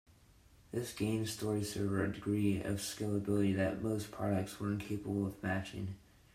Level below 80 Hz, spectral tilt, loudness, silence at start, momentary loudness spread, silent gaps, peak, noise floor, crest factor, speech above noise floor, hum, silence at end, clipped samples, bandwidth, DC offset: -64 dBFS; -6 dB/octave; -37 LUFS; 0.7 s; 8 LU; none; -20 dBFS; -63 dBFS; 16 dB; 28 dB; none; 0.35 s; under 0.1%; 16 kHz; under 0.1%